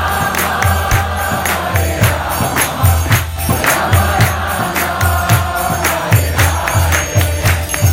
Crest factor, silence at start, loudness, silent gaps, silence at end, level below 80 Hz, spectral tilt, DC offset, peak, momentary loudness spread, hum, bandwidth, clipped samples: 14 dB; 0 s; -14 LUFS; none; 0 s; -24 dBFS; -4 dB/octave; under 0.1%; 0 dBFS; 4 LU; none; 17.5 kHz; under 0.1%